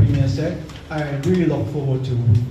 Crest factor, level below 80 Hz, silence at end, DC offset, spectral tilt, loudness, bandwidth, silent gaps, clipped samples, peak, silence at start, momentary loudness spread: 14 dB; -38 dBFS; 0 s; under 0.1%; -8.5 dB/octave; -21 LUFS; 8.4 kHz; none; under 0.1%; -6 dBFS; 0 s; 8 LU